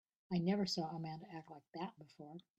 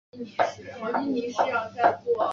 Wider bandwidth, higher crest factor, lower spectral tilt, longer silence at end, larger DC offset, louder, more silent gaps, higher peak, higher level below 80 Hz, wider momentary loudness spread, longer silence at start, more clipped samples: first, 13 kHz vs 7.4 kHz; about the same, 18 dB vs 20 dB; about the same, -6 dB/octave vs -5 dB/octave; first, 0.2 s vs 0 s; neither; second, -41 LUFS vs -27 LUFS; first, 1.68-1.72 s vs none; second, -24 dBFS vs -8 dBFS; second, -80 dBFS vs -68 dBFS; first, 18 LU vs 7 LU; first, 0.3 s vs 0.15 s; neither